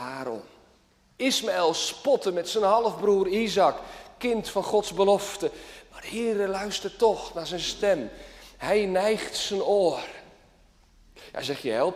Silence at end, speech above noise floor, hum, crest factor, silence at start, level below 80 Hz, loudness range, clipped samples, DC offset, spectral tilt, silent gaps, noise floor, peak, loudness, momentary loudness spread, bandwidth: 0 s; 36 dB; none; 18 dB; 0 s; -56 dBFS; 3 LU; under 0.1%; under 0.1%; -3.5 dB/octave; none; -61 dBFS; -8 dBFS; -26 LUFS; 16 LU; 15.5 kHz